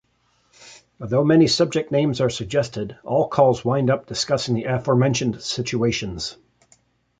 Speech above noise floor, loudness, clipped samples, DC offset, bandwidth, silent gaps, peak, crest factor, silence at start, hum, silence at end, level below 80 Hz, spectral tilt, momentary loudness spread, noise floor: 44 dB; -21 LUFS; under 0.1%; under 0.1%; 9.4 kHz; none; -2 dBFS; 18 dB; 0.6 s; none; 0.85 s; -50 dBFS; -5.5 dB/octave; 10 LU; -64 dBFS